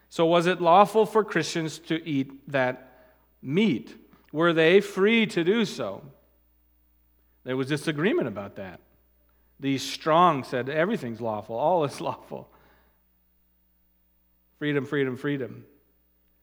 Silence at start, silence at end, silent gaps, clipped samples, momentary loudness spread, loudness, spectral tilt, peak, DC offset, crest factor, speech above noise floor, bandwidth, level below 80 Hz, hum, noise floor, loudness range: 0.1 s; 0.8 s; none; under 0.1%; 17 LU; -25 LUFS; -5.5 dB/octave; -4 dBFS; under 0.1%; 22 dB; 42 dB; 18.5 kHz; -68 dBFS; none; -66 dBFS; 9 LU